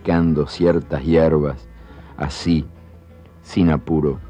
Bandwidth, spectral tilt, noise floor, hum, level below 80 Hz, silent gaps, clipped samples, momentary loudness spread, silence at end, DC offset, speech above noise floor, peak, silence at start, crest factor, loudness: 9.6 kHz; -8 dB/octave; -44 dBFS; none; -34 dBFS; none; under 0.1%; 13 LU; 0 s; under 0.1%; 26 dB; -4 dBFS; 0.05 s; 14 dB; -19 LUFS